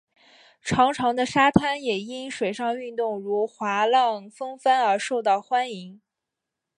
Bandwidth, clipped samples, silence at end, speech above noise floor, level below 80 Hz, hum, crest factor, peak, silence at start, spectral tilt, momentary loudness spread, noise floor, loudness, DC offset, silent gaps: 11 kHz; under 0.1%; 0.85 s; 62 dB; -54 dBFS; none; 22 dB; -2 dBFS; 0.65 s; -4.5 dB/octave; 11 LU; -85 dBFS; -23 LUFS; under 0.1%; none